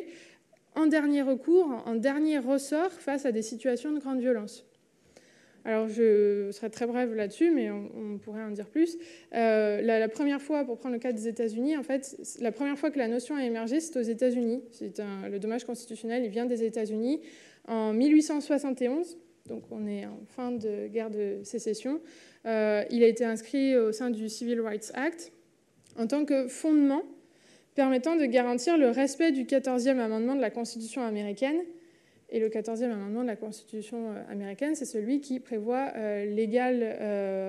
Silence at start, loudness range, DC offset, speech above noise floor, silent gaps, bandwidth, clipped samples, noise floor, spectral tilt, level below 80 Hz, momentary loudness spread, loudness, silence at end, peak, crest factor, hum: 0 s; 6 LU; under 0.1%; 35 dB; none; 12.5 kHz; under 0.1%; -64 dBFS; -5 dB/octave; -86 dBFS; 13 LU; -29 LUFS; 0 s; -10 dBFS; 18 dB; none